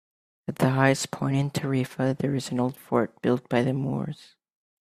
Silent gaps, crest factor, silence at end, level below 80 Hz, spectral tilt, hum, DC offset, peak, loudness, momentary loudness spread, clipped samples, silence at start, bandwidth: none; 22 dB; 0.55 s; -62 dBFS; -6 dB/octave; none; under 0.1%; -6 dBFS; -26 LUFS; 10 LU; under 0.1%; 0.5 s; 15 kHz